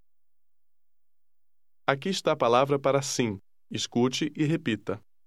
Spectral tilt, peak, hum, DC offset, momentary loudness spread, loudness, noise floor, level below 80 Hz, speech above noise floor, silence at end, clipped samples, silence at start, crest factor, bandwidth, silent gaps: -4.5 dB/octave; -4 dBFS; none; 0.2%; 10 LU; -27 LUFS; -89 dBFS; -72 dBFS; 62 dB; 0.3 s; under 0.1%; 1.9 s; 24 dB; 14.5 kHz; none